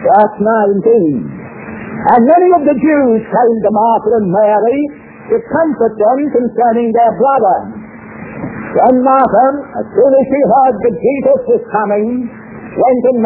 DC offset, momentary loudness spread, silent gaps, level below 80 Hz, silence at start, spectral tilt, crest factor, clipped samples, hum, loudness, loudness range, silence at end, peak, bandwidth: under 0.1%; 15 LU; none; -48 dBFS; 0 s; -11.5 dB/octave; 10 dB; under 0.1%; none; -11 LUFS; 2 LU; 0 s; 0 dBFS; 4 kHz